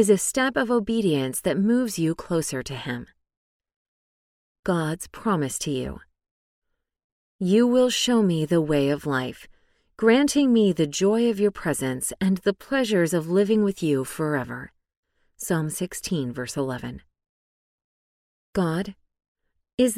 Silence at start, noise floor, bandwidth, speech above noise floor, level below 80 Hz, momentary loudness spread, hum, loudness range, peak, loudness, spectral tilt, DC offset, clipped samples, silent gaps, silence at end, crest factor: 0 s; under -90 dBFS; 16 kHz; over 67 dB; -54 dBFS; 12 LU; none; 9 LU; -6 dBFS; -24 LUFS; -5 dB/octave; under 0.1%; under 0.1%; 3.37-3.60 s, 3.76-4.63 s, 6.31-6.62 s, 7.04-7.39 s, 14.97-15.03 s, 17.29-18.53 s, 19.28-19.35 s, 19.74-19.78 s; 0 s; 18 dB